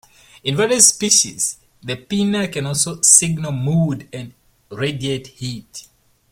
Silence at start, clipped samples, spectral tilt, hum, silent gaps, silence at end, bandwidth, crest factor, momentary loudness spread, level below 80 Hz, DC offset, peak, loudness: 0.45 s; under 0.1%; -3 dB/octave; none; none; 0.5 s; 16.5 kHz; 20 dB; 23 LU; -54 dBFS; under 0.1%; 0 dBFS; -16 LUFS